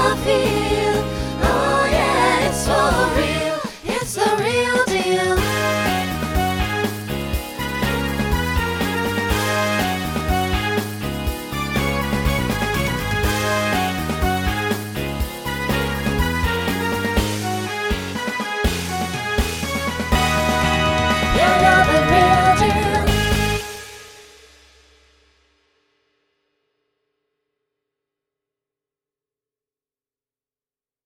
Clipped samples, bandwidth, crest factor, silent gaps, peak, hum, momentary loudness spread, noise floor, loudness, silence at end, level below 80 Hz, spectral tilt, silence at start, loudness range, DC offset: under 0.1%; 17.5 kHz; 20 dB; none; -2 dBFS; none; 9 LU; under -90 dBFS; -19 LUFS; 6.8 s; -30 dBFS; -4.5 dB/octave; 0 s; 6 LU; under 0.1%